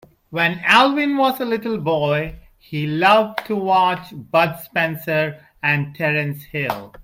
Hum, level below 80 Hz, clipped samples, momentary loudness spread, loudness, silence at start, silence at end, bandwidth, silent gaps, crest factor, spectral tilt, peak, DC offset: none; -50 dBFS; under 0.1%; 12 LU; -19 LUFS; 0.3 s; 0 s; 16.5 kHz; none; 18 dB; -6 dB/octave; 0 dBFS; under 0.1%